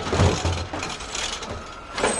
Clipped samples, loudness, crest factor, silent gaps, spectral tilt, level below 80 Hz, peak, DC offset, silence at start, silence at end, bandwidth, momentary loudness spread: under 0.1%; -26 LUFS; 20 dB; none; -4 dB/octave; -40 dBFS; -6 dBFS; under 0.1%; 0 s; 0 s; 11.5 kHz; 12 LU